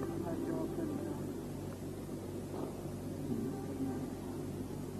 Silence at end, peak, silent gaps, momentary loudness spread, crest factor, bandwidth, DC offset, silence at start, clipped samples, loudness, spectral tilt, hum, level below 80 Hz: 0 s; -26 dBFS; none; 5 LU; 14 dB; 14 kHz; under 0.1%; 0 s; under 0.1%; -41 LUFS; -7 dB/octave; none; -58 dBFS